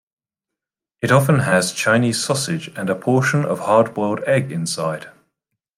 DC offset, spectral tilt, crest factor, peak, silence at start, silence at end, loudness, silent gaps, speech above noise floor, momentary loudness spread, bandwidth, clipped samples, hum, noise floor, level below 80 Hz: under 0.1%; -5 dB/octave; 18 dB; -2 dBFS; 1 s; 0.7 s; -18 LUFS; none; 67 dB; 8 LU; 16 kHz; under 0.1%; none; -85 dBFS; -60 dBFS